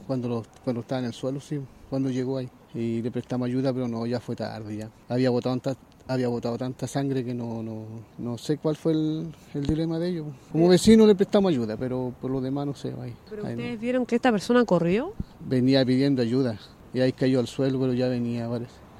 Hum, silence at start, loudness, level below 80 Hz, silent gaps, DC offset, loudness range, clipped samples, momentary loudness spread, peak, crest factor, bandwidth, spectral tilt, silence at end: none; 0 s; -26 LUFS; -52 dBFS; none; under 0.1%; 7 LU; under 0.1%; 14 LU; -4 dBFS; 20 dB; 14 kHz; -7 dB/octave; 0 s